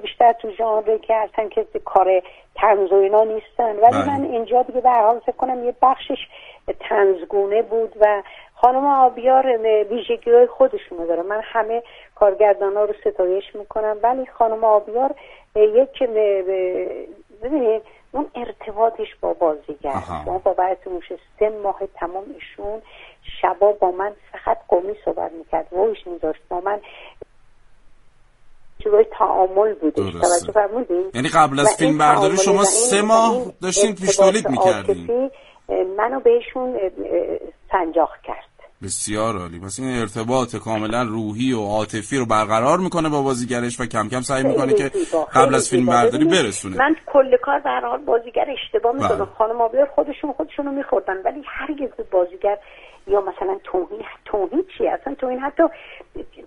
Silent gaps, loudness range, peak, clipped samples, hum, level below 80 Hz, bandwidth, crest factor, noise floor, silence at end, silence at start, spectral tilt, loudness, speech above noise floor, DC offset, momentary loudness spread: none; 7 LU; 0 dBFS; under 0.1%; none; -50 dBFS; 11.5 kHz; 20 dB; -49 dBFS; 0.05 s; 0 s; -4 dB/octave; -19 LUFS; 30 dB; under 0.1%; 13 LU